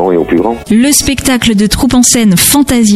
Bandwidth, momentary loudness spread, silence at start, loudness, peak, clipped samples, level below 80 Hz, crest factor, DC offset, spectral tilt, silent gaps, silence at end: 16.5 kHz; 5 LU; 0 s; -8 LUFS; 0 dBFS; 0.2%; -28 dBFS; 8 dB; under 0.1%; -3.5 dB/octave; none; 0 s